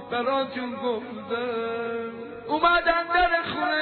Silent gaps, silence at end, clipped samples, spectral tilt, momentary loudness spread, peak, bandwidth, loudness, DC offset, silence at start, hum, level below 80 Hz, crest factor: none; 0 s; under 0.1%; -7 dB/octave; 11 LU; -10 dBFS; 4.6 kHz; -25 LUFS; under 0.1%; 0 s; none; -50 dBFS; 16 dB